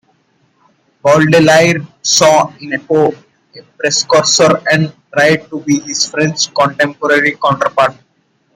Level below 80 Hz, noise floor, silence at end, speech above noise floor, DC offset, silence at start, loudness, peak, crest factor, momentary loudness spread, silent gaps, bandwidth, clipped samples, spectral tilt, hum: -54 dBFS; -58 dBFS; 0.65 s; 47 dB; under 0.1%; 1.05 s; -11 LUFS; 0 dBFS; 12 dB; 8 LU; none; 16 kHz; under 0.1%; -3.5 dB/octave; none